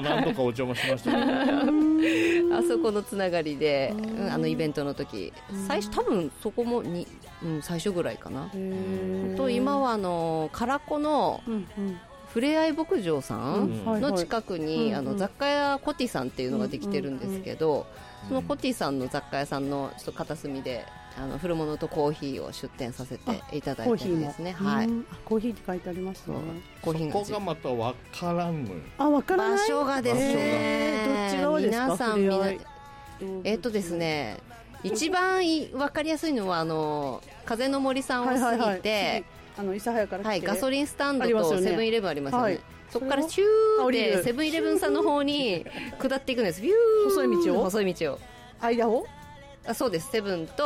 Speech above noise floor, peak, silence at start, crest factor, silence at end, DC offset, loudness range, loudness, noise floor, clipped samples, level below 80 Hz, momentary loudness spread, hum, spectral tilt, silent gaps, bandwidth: 20 dB; -14 dBFS; 0 s; 12 dB; 0 s; under 0.1%; 7 LU; -27 LUFS; -47 dBFS; under 0.1%; -54 dBFS; 12 LU; none; -5.5 dB/octave; none; 16 kHz